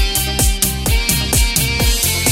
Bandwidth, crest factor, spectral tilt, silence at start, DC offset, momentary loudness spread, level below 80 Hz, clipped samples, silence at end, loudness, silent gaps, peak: 16.5 kHz; 16 dB; -2.5 dB/octave; 0 s; under 0.1%; 2 LU; -20 dBFS; under 0.1%; 0 s; -15 LUFS; none; 0 dBFS